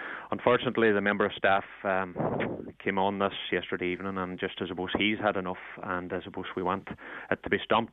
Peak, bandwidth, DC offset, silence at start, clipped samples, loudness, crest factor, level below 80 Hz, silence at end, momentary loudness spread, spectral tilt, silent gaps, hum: -8 dBFS; 4.1 kHz; under 0.1%; 0 s; under 0.1%; -30 LUFS; 22 dB; -62 dBFS; 0 s; 10 LU; -8.5 dB/octave; none; none